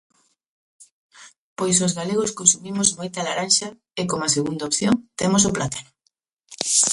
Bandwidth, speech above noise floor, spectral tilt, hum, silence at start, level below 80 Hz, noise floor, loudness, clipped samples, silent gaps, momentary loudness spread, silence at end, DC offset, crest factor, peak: 11.5 kHz; 49 dB; -3 dB/octave; none; 1.2 s; -56 dBFS; -71 dBFS; -20 LUFS; under 0.1%; 1.38-1.56 s, 6.32-6.37 s; 11 LU; 0 s; under 0.1%; 22 dB; 0 dBFS